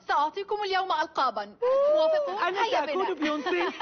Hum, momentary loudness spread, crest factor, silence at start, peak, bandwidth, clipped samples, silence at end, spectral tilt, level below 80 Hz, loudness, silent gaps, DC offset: none; 6 LU; 12 dB; 0.1 s; -14 dBFS; 6.6 kHz; under 0.1%; 0 s; 0 dB/octave; -70 dBFS; -26 LUFS; none; under 0.1%